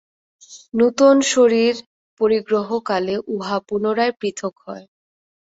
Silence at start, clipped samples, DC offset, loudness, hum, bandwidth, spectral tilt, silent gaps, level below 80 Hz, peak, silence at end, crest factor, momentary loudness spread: 0.5 s; under 0.1%; under 0.1%; -19 LUFS; none; 8 kHz; -4 dB/octave; 1.86-2.17 s; -62 dBFS; -2 dBFS; 0.8 s; 18 dB; 15 LU